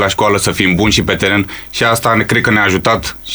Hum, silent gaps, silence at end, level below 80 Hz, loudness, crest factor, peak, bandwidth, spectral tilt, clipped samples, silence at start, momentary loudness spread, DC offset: none; none; 0 s; -34 dBFS; -12 LUFS; 12 dB; 0 dBFS; over 20 kHz; -4 dB/octave; under 0.1%; 0 s; 5 LU; under 0.1%